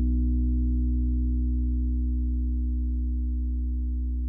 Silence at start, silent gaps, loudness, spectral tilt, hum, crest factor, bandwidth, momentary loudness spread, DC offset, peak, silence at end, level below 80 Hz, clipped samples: 0 s; none; -28 LUFS; -14.5 dB/octave; 60 Hz at -70 dBFS; 6 dB; 0.4 kHz; 4 LU; under 0.1%; -18 dBFS; 0 s; -26 dBFS; under 0.1%